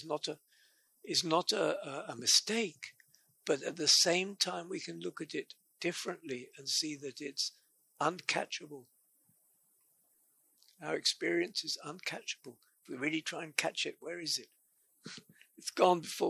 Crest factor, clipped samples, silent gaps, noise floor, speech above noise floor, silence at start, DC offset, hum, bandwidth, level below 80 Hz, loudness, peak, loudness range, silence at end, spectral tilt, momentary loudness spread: 24 dB; under 0.1%; none; -72 dBFS; 37 dB; 0 s; under 0.1%; none; 15.5 kHz; -88 dBFS; -34 LUFS; -12 dBFS; 8 LU; 0 s; -2 dB/octave; 20 LU